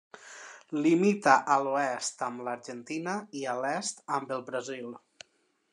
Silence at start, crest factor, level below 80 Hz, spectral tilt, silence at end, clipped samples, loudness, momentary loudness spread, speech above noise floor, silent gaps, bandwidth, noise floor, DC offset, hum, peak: 0.15 s; 24 dB; -88 dBFS; -4.5 dB/octave; 0.75 s; under 0.1%; -29 LUFS; 21 LU; 43 dB; none; 11 kHz; -72 dBFS; under 0.1%; none; -6 dBFS